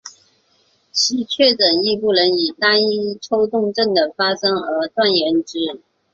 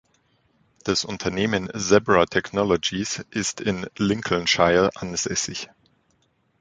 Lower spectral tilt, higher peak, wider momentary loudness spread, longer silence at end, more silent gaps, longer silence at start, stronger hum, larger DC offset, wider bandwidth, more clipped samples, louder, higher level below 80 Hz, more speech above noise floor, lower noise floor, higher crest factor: about the same, -3 dB/octave vs -3.5 dB/octave; about the same, -2 dBFS vs -2 dBFS; about the same, 7 LU vs 9 LU; second, 0.35 s vs 0.95 s; neither; second, 0.05 s vs 0.85 s; neither; neither; second, 7.8 kHz vs 9.6 kHz; neither; first, -17 LUFS vs -22 LUFS; second, -62 dBFS vs -50 dBFS; about the same, 43 dB vs 44 dB; second, -60 dBFS vs -66 dBFS; about the same, 18 dB vs 22 dB